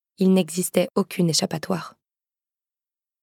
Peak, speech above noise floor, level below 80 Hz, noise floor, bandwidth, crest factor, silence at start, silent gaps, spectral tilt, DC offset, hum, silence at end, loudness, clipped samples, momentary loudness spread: -4 dBFS; over 68 dB; -70 dBFS; under -90 dBFS; 17 kHz; 20 dB; 0.2 s; none; -5 dB/octave; under 0.1%; none; 1.35 s; -22 LUFS; under 0.1%; 9 LU